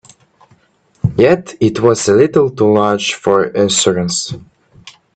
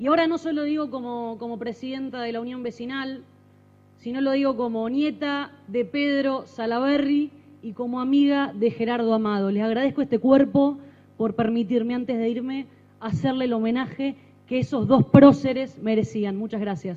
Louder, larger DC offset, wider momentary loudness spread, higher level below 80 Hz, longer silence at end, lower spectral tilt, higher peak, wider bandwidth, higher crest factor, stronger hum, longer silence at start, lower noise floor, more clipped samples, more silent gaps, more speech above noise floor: first, -13 LUFS vs -23 LUFS; neither; second, 8 LU vs 13 LU; first, -48 dBFS vs -60 dBFS; first, 0.25 s vs 0 s; second, -4.5 dB/octave vs -8 dB/octave; about the same, 0 dBFS vs 0 dBFS; first, 9.4 kHz vs 7.4 kHz; second, 14 dB vs 24 dB; second, none vs 50 Hz at -50 dBFS; first, 1.05 s vs 0 s; about the same, -54 dBFS vs -54 dBFS; neither; neither; first, 42 dB vs 32 dB